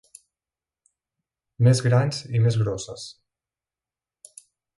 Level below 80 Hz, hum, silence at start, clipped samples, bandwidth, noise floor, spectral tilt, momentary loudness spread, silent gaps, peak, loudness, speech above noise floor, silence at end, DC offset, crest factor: -56 dBFS; none; 1.6 s; under 0.1%; 11.5 kHz; under -90 dBFS; -6 dB/octave; 17 LU; none; -8 dBFS; -22 LUFS; over 69 dB; 1.65 s; under 0.1%; 18 dB